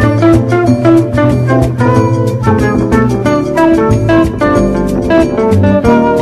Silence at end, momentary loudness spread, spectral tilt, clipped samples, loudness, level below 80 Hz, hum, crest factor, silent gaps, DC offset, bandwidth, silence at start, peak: 0 s; 3 LU; -8 dB/octave; 0.3%; -10 LUFS; -26 dBFS; none; 8 dB; none; under 0.1%; 13 kHz; 0 s; 0 dBFS